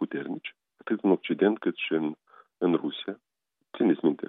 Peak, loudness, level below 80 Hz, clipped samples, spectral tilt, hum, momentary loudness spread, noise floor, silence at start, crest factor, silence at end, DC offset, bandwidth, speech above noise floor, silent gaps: -10 dBFS; -28 LUFS; -88 dBFS; under 0.1%; -10 dB/octave; none; 19 LU; -50 dBFS; 0 s; 18 dB; 0.05 s; under 0.1%; 4 kHz; 23 dB; none